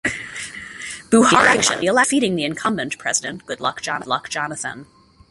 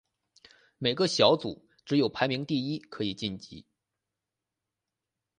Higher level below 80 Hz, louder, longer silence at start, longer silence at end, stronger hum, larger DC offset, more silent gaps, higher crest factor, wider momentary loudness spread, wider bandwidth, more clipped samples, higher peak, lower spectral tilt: first, -54 dBFS vs -66 dBFS; first, -18 LUFS vs -28 LUFS; second, 0.05 s vs 0.8 s; second, 0.45 s vs 1.8 s; neither; neither; neither; second, 20 dB vs 26 dB; about the same, 17 LU vs 16 LU; about the same, 11.5 kHz vs 10.5 kHz; neither; first, 0 dBFS vs -6 dBFS; second, -2.5 dB/octave vs -5 dB/octave